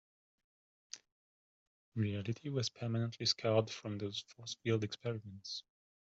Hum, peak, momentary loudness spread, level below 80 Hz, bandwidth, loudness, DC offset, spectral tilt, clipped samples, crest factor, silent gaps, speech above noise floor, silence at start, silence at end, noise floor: none; -18 dBFS; 13 LU; -76 dBFS; 8 kHz; -38 LUFS; under 0.1%; -5 dB/octave; under 0.1%; 22 dB; 1.12-1.92 s; over 52 dB; 0.95 s; 0.4 s; under -90 dBFS